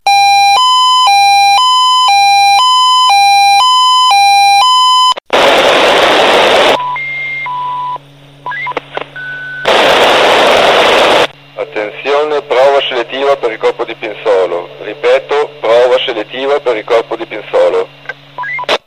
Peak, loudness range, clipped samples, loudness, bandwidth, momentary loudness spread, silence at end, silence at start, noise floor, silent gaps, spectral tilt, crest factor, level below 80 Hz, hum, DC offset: 0 dBFS; 7 LU; 0.3%; -8 LUFS; 16 kHz; 14 LU; 0.1 s; 0.05 s; -35 dBFS; none; -1.5 dB/octave; 10 dB; -48 dBFS; none; 0.3%